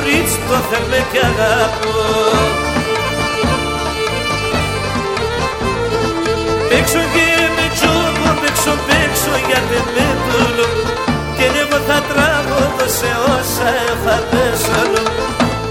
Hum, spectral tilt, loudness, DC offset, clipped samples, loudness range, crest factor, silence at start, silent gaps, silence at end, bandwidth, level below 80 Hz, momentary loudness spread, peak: none; -4 dB/octave; -14 LUFS; 0.2%; under 0.1%; 3 LU; 14 dB; 0 s; none; 0 s; 17 kHz; -30 dBFS; 5 LU; 0 dBFS